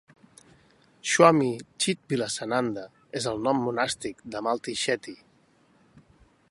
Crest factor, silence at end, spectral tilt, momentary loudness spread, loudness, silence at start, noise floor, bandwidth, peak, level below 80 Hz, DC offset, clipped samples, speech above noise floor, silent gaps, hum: 24 dB; 1.35 s; -4 dB/octave; 16 LU; -26 LUFS; 1.05 s; -62 dBFS; 11.5 kHz; -4 dBFS; -66 dBFS; under 0.1%; under 0.1%; 37 dB; none; none